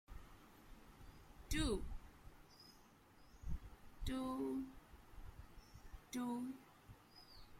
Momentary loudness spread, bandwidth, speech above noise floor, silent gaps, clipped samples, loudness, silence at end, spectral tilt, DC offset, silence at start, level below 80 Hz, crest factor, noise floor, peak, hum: 21 LU; 16.5 kHz; 24 dB; none; under 0.1%; -46 LUFS; 0 s; -5 dB/octave; under 0.1%; 0.1 s; -54 dBFS; 22 dB; -66 dBFS; -26 dBFS; none